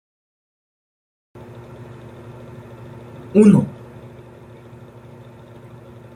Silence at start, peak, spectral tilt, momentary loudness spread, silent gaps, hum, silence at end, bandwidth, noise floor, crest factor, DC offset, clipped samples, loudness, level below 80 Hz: 3.35 s; -2 dBFS; -9 dB/octave; 29 LU; none; none; 2.45 s; 10.5 kHz; -42 dBFS; 22 dB; under 0.1%; under 0.1%; -15 LUFS; -56 dBFS